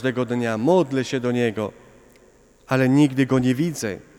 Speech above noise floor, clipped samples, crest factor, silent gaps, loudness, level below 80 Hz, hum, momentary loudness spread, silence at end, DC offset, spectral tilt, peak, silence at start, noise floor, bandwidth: 33 dB; under 0.1%; 16 dB; none; -21 LUFS; -58 dBFS; none; 7 LU; 0.2 s; under 0.1%; -6.5 dB/octave; -6 dBFS; 0 s; -54 dBFS; 15.5 kHz